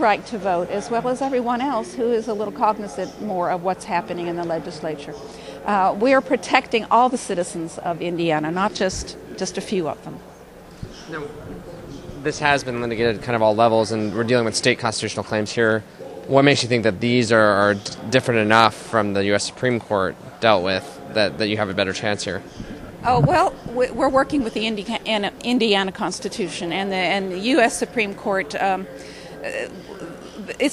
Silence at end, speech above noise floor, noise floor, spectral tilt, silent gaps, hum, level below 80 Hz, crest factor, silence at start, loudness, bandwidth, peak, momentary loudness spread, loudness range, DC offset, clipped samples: 0 s; 22 dB; -42 dBFS; -4.5 dB/octave; none; none; -50 dBFS; 22 dB; 0 s; -21 LUFS; 14 kHz; 0 dBFS; 16 LU; 7 LU; under 0.1%; under 0.1%